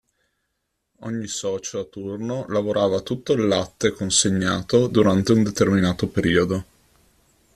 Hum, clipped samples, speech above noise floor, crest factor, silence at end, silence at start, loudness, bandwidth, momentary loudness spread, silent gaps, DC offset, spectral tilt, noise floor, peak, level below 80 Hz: none; under 0.1%; 55 dB; 20 dB; 0.95 s; 1 s; -21 LUFS; 13.5 kHz; 12 LU; none; under 0.1%; -4.5 dB/octave; -76 dBFS; -2 dBFS; -52 dBFS